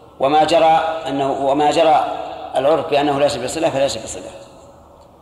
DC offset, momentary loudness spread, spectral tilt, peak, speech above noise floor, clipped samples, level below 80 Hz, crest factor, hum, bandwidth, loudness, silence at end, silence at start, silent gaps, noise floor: under 0.1%; 13 LU; -4 dB/octave; -4 dBFS; 28 dB; under 0.1%; -50 dBFS; 14 dB; none; 13 kHz; -17 LUFS; 0.55 s; 0.2 s; none; -44 dBFS